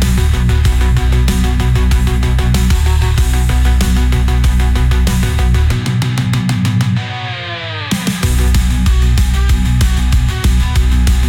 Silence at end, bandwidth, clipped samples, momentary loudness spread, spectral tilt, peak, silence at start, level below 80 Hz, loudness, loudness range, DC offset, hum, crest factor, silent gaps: 0 s; 16.5 kHz; under 0.1%; 3 LU; -5.5 dB/octave; -2 dBFS; 0 s; -12 dBFS; -14 LUFS; 2 LU; under 0.1%; none; 8 dB; none